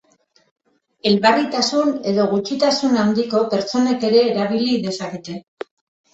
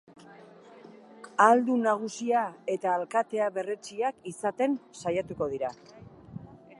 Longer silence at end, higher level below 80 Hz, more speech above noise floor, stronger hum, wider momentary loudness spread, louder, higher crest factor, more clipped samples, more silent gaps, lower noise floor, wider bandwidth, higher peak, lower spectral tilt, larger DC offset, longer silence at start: first, 0.75 s vs 0.25 s; first, -62 dBFS vs -68 dBFS; first, 42 dB vs 24 dB; neither; about the same, 16 LU vs 14 LU; first, -18 LUFS vs -28 LUFS; second, 16 dB vs 22 dB; neither; neither; first, -59 dBFS vs -51 dBFS; second, 8.2 kHz vs 11.5 kHz; first, -2 dBFS vs -6 dBFS; about the same, -5 dB/octave vs -5 dB/octave; neither; first, 1.05 s vs 0.3 s